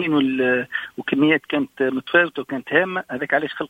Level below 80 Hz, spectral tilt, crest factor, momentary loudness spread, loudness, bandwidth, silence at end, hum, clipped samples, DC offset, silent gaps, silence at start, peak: -64 dBFS; -7 dB/octave; 20 dB; 8 LU; -21 LUFS; 8.2 kHz; 0.05 s; none; under 0.1%; under 0.1%; none; 0 s; -2 dBFS